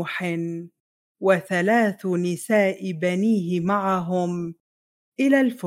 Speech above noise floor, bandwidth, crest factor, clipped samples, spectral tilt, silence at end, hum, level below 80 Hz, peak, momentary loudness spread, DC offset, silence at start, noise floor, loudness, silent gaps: over 68 dB; 16 kHz; 18 dB; under 0.1%; -6.5 dB/octave; 0 s; none; -70 dBFS; -4 dBFS; 10 LU; under 0.1%; 0 s; under -90 dBFS; -23 LUFS; 0.80-1.15 s, 4.60-5.12 s